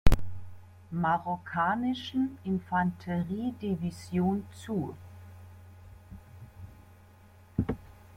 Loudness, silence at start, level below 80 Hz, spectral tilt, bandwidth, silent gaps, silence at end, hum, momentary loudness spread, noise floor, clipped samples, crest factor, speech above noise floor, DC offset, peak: -32 LUFS; 0.05 s; -40 dBFS; -7 dB/octave; 16 kHz; none; 0.35 s; none; 22 LU; -55 dBFS; under 0.1%; 24 dB; 24 dB; under 0.1%; -6 dBFS